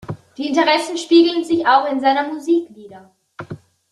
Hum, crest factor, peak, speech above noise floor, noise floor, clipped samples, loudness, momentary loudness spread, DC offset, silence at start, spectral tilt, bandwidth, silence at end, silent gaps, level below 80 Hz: none; 16 dB; -2 dBFS; 19 dB; -36 dBFS; under 0.1%; -16 LUFS; 22 LU; under 0.1%; 0.1 s; -4.5 dB/octave; 11.5 kHz; 0.35 s; none; -62 dBFS